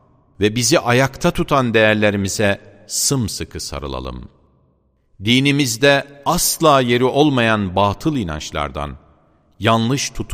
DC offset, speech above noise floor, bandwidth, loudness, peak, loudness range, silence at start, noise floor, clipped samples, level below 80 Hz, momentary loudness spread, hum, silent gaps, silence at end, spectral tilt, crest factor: under 0.1%; 43 dB; 15.5 kHz; -17 LUFS; 0 dBFS; 5 LU; 0.4 s; -60 dBFS; under 0.1%; -38 dBFS; 13 LU; none; none; 0 s; -4 dB/octave; 18 dB